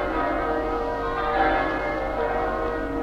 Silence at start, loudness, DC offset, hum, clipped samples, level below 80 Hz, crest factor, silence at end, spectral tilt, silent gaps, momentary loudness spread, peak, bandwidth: 0 s; -25 LUFS; under 0.1%; 50 Hz at -40 dBFS; under 0.1%; -36 dBFS; 16 dB; 0 s; -6.5 dB/octave; none; 5 LU; -10 dBFS; 15 kHz